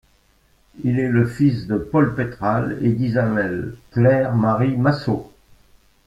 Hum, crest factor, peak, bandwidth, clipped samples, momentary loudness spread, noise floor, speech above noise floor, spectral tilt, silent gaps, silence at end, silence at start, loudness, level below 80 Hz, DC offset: none; 18 dB; -2 dBFS; 7.8 kHz; under 0.1%; 8 LU; -58 dBFS; 40 dB; -9 dB/octave; none; 0.8 s; 0.75 s; -20 LUFS; -48 dBFS; under 0.1%